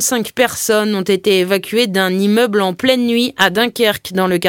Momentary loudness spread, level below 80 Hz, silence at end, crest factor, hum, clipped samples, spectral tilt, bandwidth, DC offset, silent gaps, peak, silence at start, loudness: 3 LU; -56 dBFS; 0 s; 14 dB; none; under 0.1%; -3.5 dB/octave; 17 kHz; under 0.1%; none; 0 dBFS; 0 s; -14 LUFS